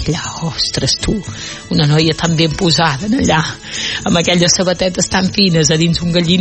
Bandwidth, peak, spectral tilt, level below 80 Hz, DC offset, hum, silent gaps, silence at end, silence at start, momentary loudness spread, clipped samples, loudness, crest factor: 8.8 kHz; 0 dBFS; -4 dB/octave; -34 dBFS; under 0.1%; none; none; 0 s; 0 s; 8 LU; under 0.1%; -13 LUFS; 14 dB